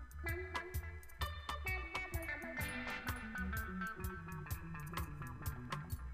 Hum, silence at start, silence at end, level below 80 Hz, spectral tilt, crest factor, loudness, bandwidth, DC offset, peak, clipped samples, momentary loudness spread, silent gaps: none; 0 s; 0 s; -50 dBFS; -5 dB/octave; 18 dB; -44 LUFS; 15.5 kHz; under 0.1%; -26 dBFS; under 0.1%; 5 LU; none